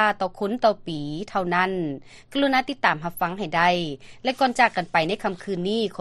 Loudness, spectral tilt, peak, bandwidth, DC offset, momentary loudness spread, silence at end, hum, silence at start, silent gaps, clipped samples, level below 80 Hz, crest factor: -24 LUFS; -5 dB/octave; -4 dBFS; 13 kHz; under 0.1%; 10 LU; 0 s; none; 0 s; none; under 0.1%; -54 dBFS; 20 dB